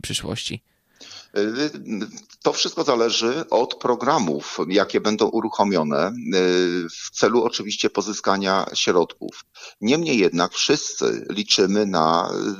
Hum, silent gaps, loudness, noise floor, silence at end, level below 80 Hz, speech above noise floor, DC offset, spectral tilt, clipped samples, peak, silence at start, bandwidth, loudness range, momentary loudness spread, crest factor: none; none; -21 LUFS; -44 dBFS; 0 s; -60 dBFS; 23 dB; under 0.1%; -3.5 dB/octave; under 0.1%; -2 dBFS; 0.05 s; 14 kHz; 2 LU; 11 LU; 20 dB